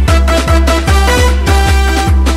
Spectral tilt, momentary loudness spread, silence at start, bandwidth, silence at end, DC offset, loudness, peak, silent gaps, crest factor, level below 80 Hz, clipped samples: -5 dB/octave; 1 LU; 0 s; 15 kHz; 0 s; under 0.1%; -10 LUFS; 0 dBFS; none; 8 dB; -10 dBFS; under 0.1%